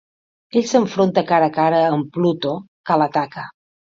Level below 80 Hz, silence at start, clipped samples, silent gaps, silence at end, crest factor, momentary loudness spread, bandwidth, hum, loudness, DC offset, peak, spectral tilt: -64 dBFS; 0.55 s; under 0.1%; 2.68-2.84 s; 0.45 s; 16 dB; 12 LU; 7.8 kHz; none; -18 LUFS; under 0.1%; -2 dBFS; -6 dB/octave